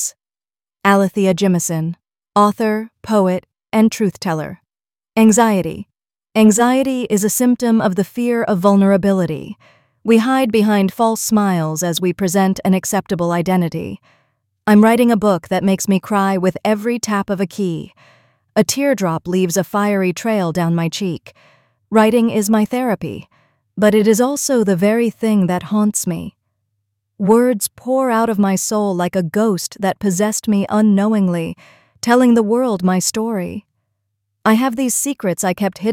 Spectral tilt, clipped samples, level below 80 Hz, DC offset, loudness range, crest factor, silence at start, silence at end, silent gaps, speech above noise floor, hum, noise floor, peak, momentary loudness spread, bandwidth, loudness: -5.5 dB/octave; under 0.1%; -54 dBFS; under 0.1%; 3 LU; 16 dB; 0 s; 0 s; none; over 75 dB; none; under -90 dBFS; -2 dBFS; 10 LU; 16.5 kHz; -16 LUFS